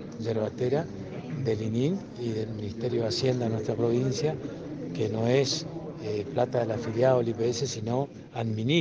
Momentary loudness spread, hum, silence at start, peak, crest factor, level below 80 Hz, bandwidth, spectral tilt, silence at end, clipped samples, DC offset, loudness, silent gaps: 11 LU; none; 0 s; -10 dBFS; 18 dB; -60 dBFS; 9.8 kHz; -6 dB/octave; 0 s; under 0.1%; under 0.1%; -29 LUFS; none